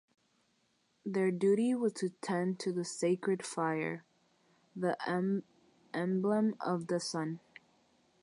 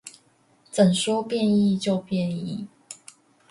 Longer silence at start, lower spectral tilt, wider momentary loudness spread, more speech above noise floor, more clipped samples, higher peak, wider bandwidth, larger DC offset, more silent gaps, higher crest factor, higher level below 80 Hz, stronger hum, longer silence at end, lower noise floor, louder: first, 1.05 s vs 0.05 s; about the same, -6 dB/octave vs -6 dB/octave; second, 10 LU vs 22 LU; first, 42 dB vs 38 dB; neither; second, -20 dBFS vs -6 dBFS; about the same, 11.5 kHz vs 11.5 kHz; neither; neither; about the same, 16 dB vs 18 dB; second, -84 dBFS vs -66 dBFS; neither; first, 0.85 s vs 0.55 s; first, -75 dBFS vs -61 dBFS; second, -34 LUFS vs -23 LUFS